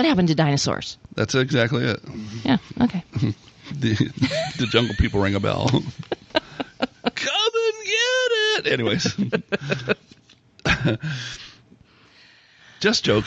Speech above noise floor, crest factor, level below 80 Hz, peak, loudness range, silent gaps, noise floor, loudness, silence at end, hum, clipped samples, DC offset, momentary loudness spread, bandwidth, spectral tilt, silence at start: 32 dB; 18 dB; -42 dBFS; -4 dBFS; 4 LU; none; -54 dBFS; -22 LUFS; 0 s; none; under 0.1%; under 0.1%; 11 LU; 8.6 kHz; -5 dB/octave; 0 s